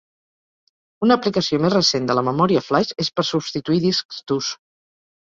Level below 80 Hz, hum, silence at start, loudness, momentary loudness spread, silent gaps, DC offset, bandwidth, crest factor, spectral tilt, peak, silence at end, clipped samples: -58 dBFS; none; 1 s; -20 LUFS; 7 LU; 4.05-4.09 s; under 0.1%; 7.6 kHz; 18 dB; -5 dB/octave; -2 dBFS; 0.65 s; under 0.1%